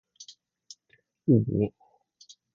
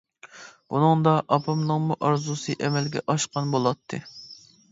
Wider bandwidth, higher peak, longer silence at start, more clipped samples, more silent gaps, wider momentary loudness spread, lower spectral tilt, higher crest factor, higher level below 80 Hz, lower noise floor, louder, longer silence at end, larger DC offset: about the same, 7.4 kHz vs 8 kHz; second, -10 dBFS vs -6 dBFS; about the same, 0.2 s vs 0.25 s; neither; neither; first, 27 LU vs 21 LU; first, -8.5 dB/octave vs -6 dB/octave; about the same, 22 dB vs 20 dB; first, -58 dBFS vs -66 dBFS; first, -68 dBFS vs -47 dBFS; about the same, -26 LUFS vs -24 LUFS; first, 0.85 s vs 0.35 s; neither